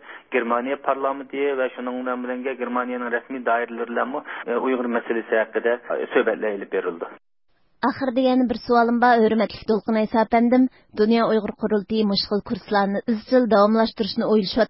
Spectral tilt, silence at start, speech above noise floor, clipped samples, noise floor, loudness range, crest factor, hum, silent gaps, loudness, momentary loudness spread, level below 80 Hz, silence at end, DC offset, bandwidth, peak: -10 dB/octave; 0.05 s; 47 dB; under 0.1%; -68 dBFS; 6 LU; 16 dB; none; none; -22 LUFS; 9 LU; -56 dBFS; 0 s; under 0.1%; 5.8 kHz; -6 dBFS